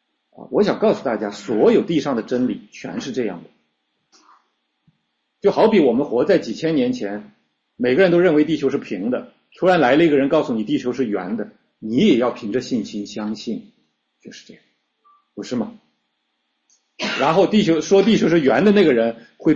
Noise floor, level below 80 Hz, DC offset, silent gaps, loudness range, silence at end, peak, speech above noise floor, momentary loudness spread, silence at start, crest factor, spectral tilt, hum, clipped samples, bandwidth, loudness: -72 dBFS; -60 dBFS; under 0.1%; none; 12 LU; 0 s; -4 dBFS; 54 dB; 14 LU; 0.4 s; 16 dB; -6 dB/octave; none; under 0.1%; 7.8 kHz; -18 LUFS